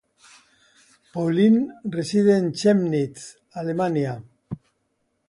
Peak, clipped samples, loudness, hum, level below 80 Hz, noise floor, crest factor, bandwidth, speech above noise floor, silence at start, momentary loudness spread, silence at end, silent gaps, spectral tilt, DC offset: -6 dBFS; under 0.1%; -22 LUFS; none; -64 dBFS; -72 dBFS; 16 dB; 11.5 kHz; 51 dB; 1.15 s; 20 LU; 0.75 s; none; -7 dB/octave; under 0.1%